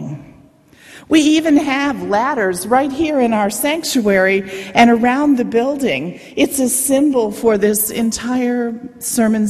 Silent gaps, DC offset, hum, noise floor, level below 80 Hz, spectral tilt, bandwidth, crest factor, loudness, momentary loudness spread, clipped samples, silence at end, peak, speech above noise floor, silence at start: none; under 0.1%; none; -46 dBFS; -50 dBFS; -4 dB/octave; 14.5 kHz; 16 dB; -15 LUFS; 7 LU; under 0.1%; 0 s; 0 dBFS; 31 dB; 0 s